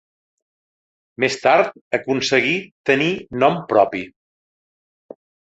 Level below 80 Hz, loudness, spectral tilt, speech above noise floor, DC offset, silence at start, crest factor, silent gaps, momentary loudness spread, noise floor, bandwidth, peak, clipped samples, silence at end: -60 dBFS; -18 LUFS; -4.5 dB/octave; over 72 dB; under 0.1%; 1.2 s; 20 dB; 1.81-1.91 s, 2.72-2.84 s; 6 LU; under -90 dBFS; 8.2 kHz; -2 dBFS; under 0.1%; 1.35 s